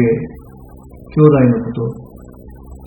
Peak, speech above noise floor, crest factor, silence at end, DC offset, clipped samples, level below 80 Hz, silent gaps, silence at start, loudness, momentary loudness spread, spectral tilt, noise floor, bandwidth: 0 dBFS; 24 dB; 16 dB; 0 s; under 0.1%; under 0.1%; -40 dBFS; none; 0 s; -14 LUFS; 18 LU; -11 dB/octave; -37 dBFS; 17 kHz